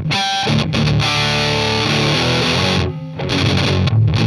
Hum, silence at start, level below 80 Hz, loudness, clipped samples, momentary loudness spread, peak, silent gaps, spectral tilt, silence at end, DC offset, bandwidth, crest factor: none; 0 s; -38 dBFS; -15 LUFS; under 0.1%; 3 LU; -2 dBFS; none; -5 dB/octave; 0 s; under 0.1%; 13.5 kHz; 14 dB